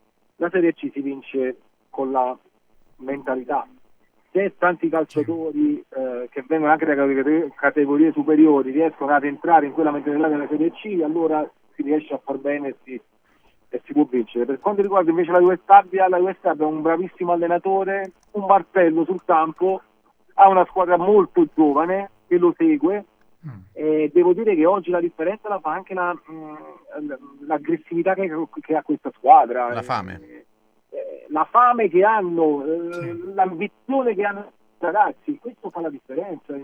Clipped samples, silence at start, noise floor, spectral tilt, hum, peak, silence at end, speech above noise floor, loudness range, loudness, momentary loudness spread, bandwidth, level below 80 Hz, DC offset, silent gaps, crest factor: under 0.1%; 0.4 s; -59 dBFS; -8.5 dB/octave; none; 0 dBFS; 0 s; 39 dB; 8 LU; -20 LUFS; 16 LU; 5.2 kHz; -68 dBFS; under 0.1%; none; 20 dB